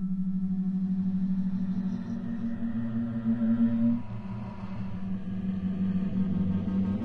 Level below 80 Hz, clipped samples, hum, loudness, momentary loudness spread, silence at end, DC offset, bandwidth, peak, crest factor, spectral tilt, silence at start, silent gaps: -50 dBFS; under 0.1%; none; -30 LUFS; 10 LU; 0 s; under 0.1%; 4.3 kHz; -16 dBFS; 12 dB; -10.5 dB/octave; 0 s; none